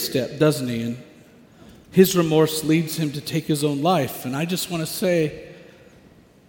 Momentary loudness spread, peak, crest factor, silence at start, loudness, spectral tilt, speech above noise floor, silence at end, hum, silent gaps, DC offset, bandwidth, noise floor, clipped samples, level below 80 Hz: 10 LU; -2 dBFS; 22 dB; 0 s; -21 LUFS; -5.5 dB/octave; 30 dB; 0.9 s; none; none; under 0.1%; 17 kHz; -51 dBFS; under 0.1%; -58 dBFS